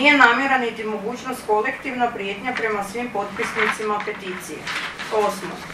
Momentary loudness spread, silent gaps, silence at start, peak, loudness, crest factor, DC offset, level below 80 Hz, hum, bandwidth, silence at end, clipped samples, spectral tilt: 11 LU; none; 0 s; 0 dBFS; -22 LUFS; 22 dB; under 0.1%; -56 dBFS; none; 15 kHz; 0 s; under 0.1%; -3.5 dB/octave